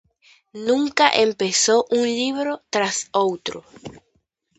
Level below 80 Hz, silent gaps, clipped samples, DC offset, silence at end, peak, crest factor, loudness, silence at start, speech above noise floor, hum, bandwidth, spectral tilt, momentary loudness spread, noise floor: -64 dBFS; none; under 0.1%; under 0.1%; 0.6 s; 0 dBFS; 22 dB; -20 LUFS; 0.55 s; 48 dB; none; 9 kHz; -2 dB/octave; 18 LU; -68 dBFS